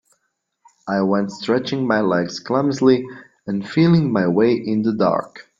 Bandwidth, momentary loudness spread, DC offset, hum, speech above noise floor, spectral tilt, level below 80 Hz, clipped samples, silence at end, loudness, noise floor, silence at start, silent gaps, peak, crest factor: 7.6 kHz; 10 LU; under 0.1%; none; 54 dB; -7 dB/octave; -58 dBFS; under 0.1%; 0.2 s; -19 LUFS; -72 dBFS; 0.85 s; none; -2 dBFS; 16 dB